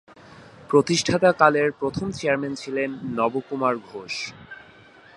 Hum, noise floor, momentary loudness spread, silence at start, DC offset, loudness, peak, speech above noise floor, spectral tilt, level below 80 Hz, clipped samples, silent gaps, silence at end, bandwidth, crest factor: none; -50 dBFS; 14 LU; 0.3 s; under 0.1%; -23 LUFS; -2 dBFS; 27 dB; -4.5 dB/octave; -56 dBFS; under 0.1%; none; 0.6 s; 11.5 kHz; 22 dB